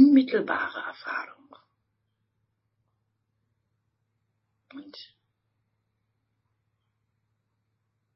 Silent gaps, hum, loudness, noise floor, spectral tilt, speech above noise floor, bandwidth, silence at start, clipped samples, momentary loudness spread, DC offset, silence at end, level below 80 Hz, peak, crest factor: none; none; -26 LUFS; -77 dBFS; -3 dB/octave; 45 dB; 5.8 kHz; 0 s; under 0.1%; 25 LU; under 0.1%; 3.15 s; -80 dBFS; -6 dBFS; 24 dB